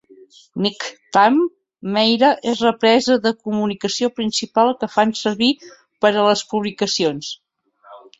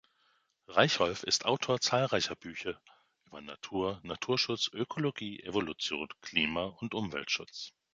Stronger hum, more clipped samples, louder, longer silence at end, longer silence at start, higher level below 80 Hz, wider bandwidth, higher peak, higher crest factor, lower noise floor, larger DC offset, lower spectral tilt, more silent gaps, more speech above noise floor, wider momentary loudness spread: neither; neither; first, -18 LUFS vs -32 LUFS; about the same, 0.2 s vs 0.25 s; second, 0.55 s vs 0.7 s; about the same, -62 dBFS vs -64 dBFS; second, 8 kHz vs 9.6 kHz; first, -2 dBFS vs -8 dBFS; second, 18 dB vs 26 dB; second, -49 dBFS vs -73 dBFS; neither; about the same, -4 dB/octave vs -3.5 dB/octave; neither; second, 31 dB vs 39 dB; second, 10 LU vs 13 LU